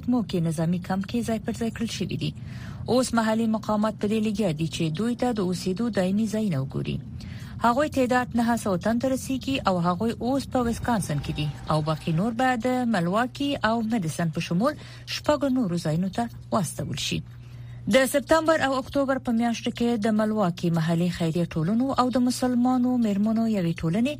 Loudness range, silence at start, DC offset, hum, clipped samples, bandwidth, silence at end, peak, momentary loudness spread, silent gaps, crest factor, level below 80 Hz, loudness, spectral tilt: 3 LU; 0 s; under 0.1%; none; under 0.1%; 15.5 kHz; 0 s; -6 dBFS; 7 LU; none; 18 dB; -48 dBFS; -25 LUFS; -6 dB/octave